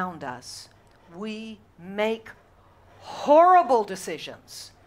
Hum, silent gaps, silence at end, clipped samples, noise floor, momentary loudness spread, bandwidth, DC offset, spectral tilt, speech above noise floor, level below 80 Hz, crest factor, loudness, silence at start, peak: none; none; 0.2 s; under 0.1%; -56 dBFS; 24 LU; 16 kHz; under 0.1%; -4.5 dB/octave; 32 dB; -64 dBFS; 20 dB; -22 LUFS; 0 s; -6 dBFS